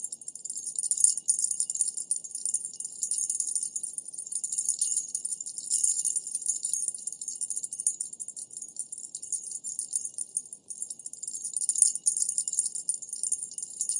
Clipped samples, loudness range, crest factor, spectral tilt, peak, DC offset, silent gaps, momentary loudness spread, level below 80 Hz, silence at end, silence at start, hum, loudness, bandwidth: under 0.1%; 6 LU; 28 dB; 2 dB/octave; -2 dBFS; under 0.1%; none; 14 LU; under -90 dBFS; 0 s; 0 s; none; -28 LUFS; 11.5 kHz